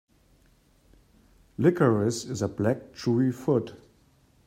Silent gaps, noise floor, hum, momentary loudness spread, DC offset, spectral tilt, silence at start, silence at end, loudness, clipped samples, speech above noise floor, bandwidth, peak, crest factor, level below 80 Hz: none; -62 dBFS; none; 9 LU; under 0.1%; -7 dB/octave; 1.6 s; 0.7 s; -26 LUFS; under 0.1%; 37 dB; 16 kHz; -8 dBFS; 20 dB; -62 dBFS